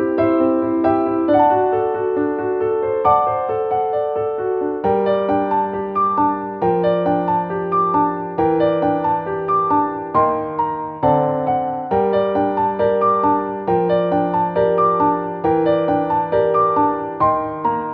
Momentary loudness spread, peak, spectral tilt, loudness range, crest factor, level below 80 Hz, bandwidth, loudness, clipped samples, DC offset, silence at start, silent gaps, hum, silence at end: 5 LU; -2 dBFS; -10 dB/octave; 2 LU; 14 dB; -50 dBFS; 5.2 kHz; -18 LUFS; under 0.1%; under 0.1%; 0 s; none; none; 0 s